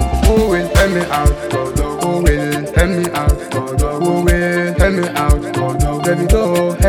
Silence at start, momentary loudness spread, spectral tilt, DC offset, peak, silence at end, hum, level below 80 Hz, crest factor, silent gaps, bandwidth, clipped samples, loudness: 0 s; 5 LU; -6 dB/octave; under 0.1%; 0 dBFS; 0 s; none; -18 dBFS; 14 dB; none; 18 kHz; under 0.1%; -15 LUFS